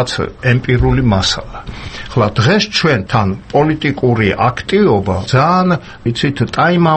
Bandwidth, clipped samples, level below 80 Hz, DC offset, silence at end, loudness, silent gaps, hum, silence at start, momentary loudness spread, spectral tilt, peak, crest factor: 8.8 kHz; under 0.1%; -32 dBFS; under 0.1%; 0 s; -13 LUFS; none; none; 0 s; 7 LU; -6 dB/octave; 0 dBFS; 14 dB